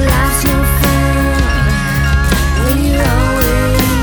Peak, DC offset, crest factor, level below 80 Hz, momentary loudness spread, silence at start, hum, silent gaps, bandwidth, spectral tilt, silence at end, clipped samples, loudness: 0 dBFS; under 0.1%; 12 dB; -16 dBFS; 1 LU; 0 s; none; none; over 20 kHz; -5 dB/octave; 0 s; under 0.1%; -13 LUFS